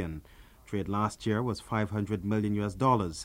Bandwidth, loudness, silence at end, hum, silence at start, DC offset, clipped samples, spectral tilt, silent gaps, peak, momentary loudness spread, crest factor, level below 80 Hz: 16 kHz; -31 LUFS; 0 s; none; 0 s; under 0.1%; under 0.1%; -6.5 dB/octave; none; -12 dBFS; 10 LU; 20 dB; -52 dBFS